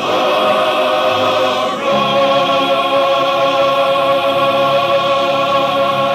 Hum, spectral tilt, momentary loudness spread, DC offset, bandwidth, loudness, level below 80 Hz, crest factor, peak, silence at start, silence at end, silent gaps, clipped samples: none; -4 dB/octave; 2 LU; under 0.1%; 15 kHz; -13 LUFS; -66 dBFS; 12 dB; -2 dBFS; 0 s; 0 s; none; under 0.1%